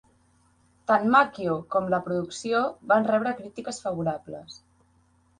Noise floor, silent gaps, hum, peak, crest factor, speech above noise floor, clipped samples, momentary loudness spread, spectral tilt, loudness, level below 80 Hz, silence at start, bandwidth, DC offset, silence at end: -63 dBFS; none; none; -6 dBFS; 20 dB; 38 dB; under 0.1%; 16 LU; -5.5 dB/octave; -25 LUFS; -64 dBFS; 0.9 s; 10.5 kHz; under 0.1%; 0.85 s